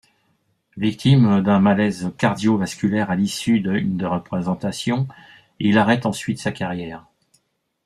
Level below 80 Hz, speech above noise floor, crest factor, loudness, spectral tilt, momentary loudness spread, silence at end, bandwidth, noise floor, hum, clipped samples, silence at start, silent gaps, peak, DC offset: -54 dBFS; 49 dB; 18 dB; -20 LUFS; -6.5 dB/octave; 9 LU; 0.85 s; 13 kHz; -68 dBFS; none; under 0.1%; 0.75 s; none; -2 dBFS; under 0.1%